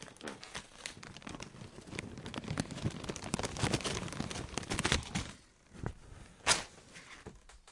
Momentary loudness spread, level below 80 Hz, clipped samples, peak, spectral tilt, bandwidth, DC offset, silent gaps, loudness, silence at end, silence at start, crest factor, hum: 19 LU; -54 dBFS; under 0.1%; -10 dBFS; -3 dB/octave; 11.5 kHz; under 0.1%; none; -38 LUFS; 0 s; 0 s; 30 dB; none